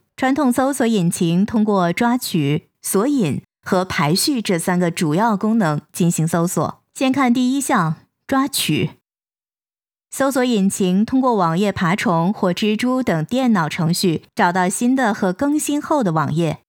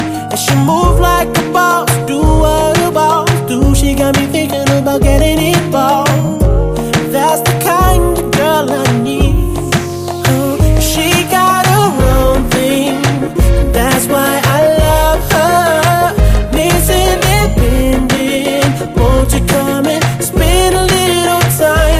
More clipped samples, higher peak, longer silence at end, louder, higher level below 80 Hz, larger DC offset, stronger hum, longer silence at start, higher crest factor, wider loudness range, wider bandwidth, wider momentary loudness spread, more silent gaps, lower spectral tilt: second, under 0.1% vs 0.1%; second, -4 dBFS vs 0 dBFS; first, 0.15 s vs 0 s; second, -18 LUFS vs -11 LUFS; second, -58 dBFS vs -16 dBFS; neither; neither; first, 0.2 s vs 0 s; first, 16 dB vs 10 dB; about the same, 2 LU vs 2 LU; first, over 20 kHz vs 16 kHz; about the same, 4 LU vs 3 LU; neither; about the same, -5 dB/octave vs -5 dB/octave